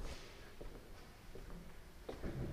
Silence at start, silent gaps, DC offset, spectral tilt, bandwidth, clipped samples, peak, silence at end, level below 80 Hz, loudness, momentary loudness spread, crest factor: 0 s; none; under 0.1%; -6 dB/octave; 15.5 kHz; under 0.1%; -32 dBFS; 0 s; -52 dBFS; -53 LUFS; 10 LU; 18 dB